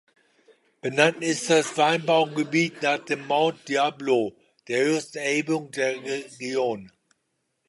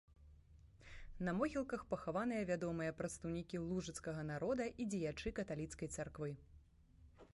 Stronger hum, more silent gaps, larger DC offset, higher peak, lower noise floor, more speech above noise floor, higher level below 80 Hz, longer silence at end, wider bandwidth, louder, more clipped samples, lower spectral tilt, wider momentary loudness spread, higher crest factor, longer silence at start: neither; neither; neither; first, -2 dBFS vs -26 dBFS; first, -76 dBFS vs -66 dBFS; first, 52 dB vs 23 dB; second, -76 dBFS vs -62 dBFS; first, 0.8 s vs 0.1 s; about the same, 11.5 kHz vs 11.5 kHz; first, -24 LUFS vs -43 LUFS; neither; second, -4 dB/octave vs -6 dB/octave; about the same, 9 LU vs 8 LU; about the same, 22 dB vs 18 dB; first, 0.85 s vs 0.1 s